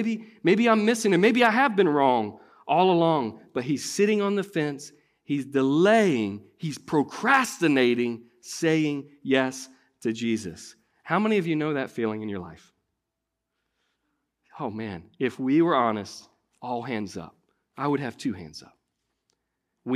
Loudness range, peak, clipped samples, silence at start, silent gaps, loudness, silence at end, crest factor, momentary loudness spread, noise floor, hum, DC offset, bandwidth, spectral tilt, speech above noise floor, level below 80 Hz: 11 LU; -6 dBFS; under 0.1%; 0 s; none; -24 LUFS; 0 s; 20 dB; 18 LU; -83 dBFS; none; under 0.1%; 15 kHz; -5.5 dB/octave; 59 dB; -70 dBFS